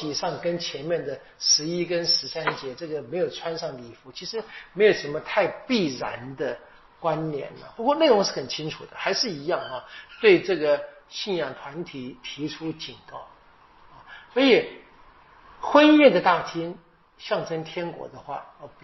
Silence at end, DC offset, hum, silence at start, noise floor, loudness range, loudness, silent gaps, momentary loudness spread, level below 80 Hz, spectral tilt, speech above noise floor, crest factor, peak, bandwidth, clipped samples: 0.15 s; under 0.1%; none; 0 s; -54 dBFS; 7 LU; -24 LUFS; none; 18 LU; -62 dBFS; -2.5 dB/octave; 30 dB; 22 dB; -4 dBFS; 6.2 kHz; under 0.1%